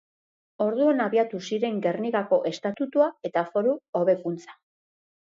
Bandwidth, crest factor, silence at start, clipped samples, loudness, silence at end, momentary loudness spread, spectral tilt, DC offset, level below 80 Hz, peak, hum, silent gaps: 7.6 kHz; 16 dB; 0.6 s; under 0.1%; -25 LUFS; 0.7 s; 6 LU; -6.5 dB/octave; under 0.1%; -78 dBFS; -8 dBFS; none; 3.89-3.93 s